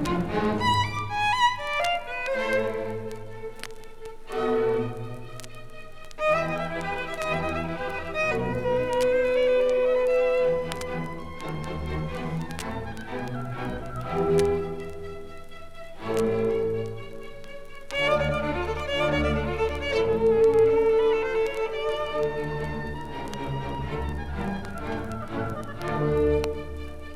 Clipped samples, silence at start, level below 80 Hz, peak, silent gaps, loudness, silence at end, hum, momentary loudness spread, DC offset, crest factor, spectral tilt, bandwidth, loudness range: under 0.1%; 0 s; -40 dBFS; -8 dBFS; none; -26 LUFS; 0 s; none; 17 LU; under 0.1%; 18 dB; -5.5 dB/octave; 14.5 kHz; 8 LU